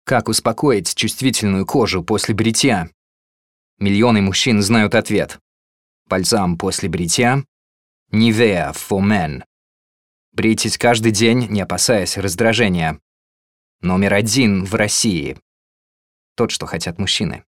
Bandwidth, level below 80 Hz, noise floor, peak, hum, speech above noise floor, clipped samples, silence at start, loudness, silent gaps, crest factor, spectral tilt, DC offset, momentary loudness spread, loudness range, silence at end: 16.5 kHz; -46 dBFS; under -90 dBFS; 0 dBFS; none; over 74 dB; under 0.1%; 0.05 s; -16 LUFS; 2.94-3.77 s, 5.41-6.06 s, 7.48-8.06 s, 9.46-10.32 s, 13.02-13.79 s, 15.42-16.36 s; 18 dB; -4 dB/octave; 0.3%; 8 LU; 2 LU; 0.1 s